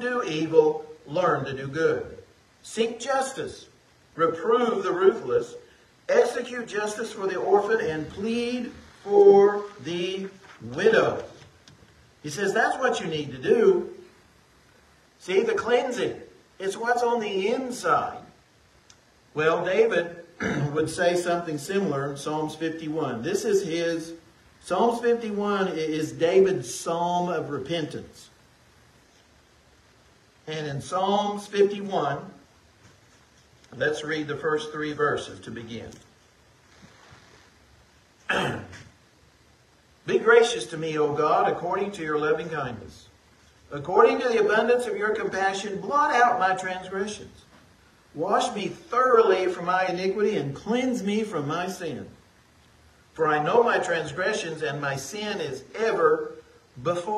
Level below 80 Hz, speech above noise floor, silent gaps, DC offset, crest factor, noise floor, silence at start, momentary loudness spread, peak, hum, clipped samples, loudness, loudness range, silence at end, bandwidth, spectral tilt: -62 dBFS; 34 dB; none; under 0.1%; 22 dB; -59 dBFS; 0 s; 16 LU; -4 dBFS; none; under 0.1%; -25 LUFS; 8 LU; 0 s; 13 kHz; -5 dB/octave